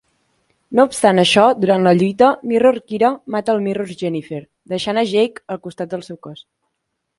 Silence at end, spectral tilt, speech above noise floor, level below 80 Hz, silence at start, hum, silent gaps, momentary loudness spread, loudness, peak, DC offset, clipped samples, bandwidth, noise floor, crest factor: 0.85 s; -5 dB/octave; 59 dB; -58 dBFS; 0.7 s; none; none; 16 LU; -16 LUFS; 0 dBFS; under 0.1%; under 0.1%; 11.5 kHz; -75 dBFS; 18 dB